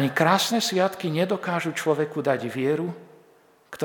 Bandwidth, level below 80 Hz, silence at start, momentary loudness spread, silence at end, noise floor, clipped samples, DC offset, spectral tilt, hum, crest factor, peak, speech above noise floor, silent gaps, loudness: 19 kHz; -76 dBFS; 0 s; 8 LU; 0 s; -57 dBFS; under 0.1%; under 0.1%; -4.5 dB/octave; none; 20 dB; -4 dBFS; 33 dB; none; -24 LUFS